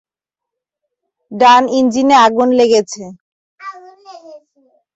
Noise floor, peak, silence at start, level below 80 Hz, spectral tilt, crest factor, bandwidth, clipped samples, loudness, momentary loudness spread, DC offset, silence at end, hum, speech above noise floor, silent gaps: -84 dBFS; 0 dBFS; 1.3 s; -60 dBFS; -3.5 dB/octave; 14 dB; 8.2 kHz; under 0.1%; -11 LUFS; 23 LU; under 0.1%; 0.6 s; none; 73 dB; 3.21-3.58 s